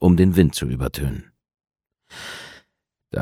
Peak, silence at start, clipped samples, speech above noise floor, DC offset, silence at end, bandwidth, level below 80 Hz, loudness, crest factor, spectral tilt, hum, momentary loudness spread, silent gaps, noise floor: -2 dBFS; 0 s; under 0.1%; 55 dB; under 0.1%; 0 s; 15.5 kHz; -36 dBFS; -20 LUFS; 20 dB; -7 dB/octave; none; 22 LU; none; -75 dBFS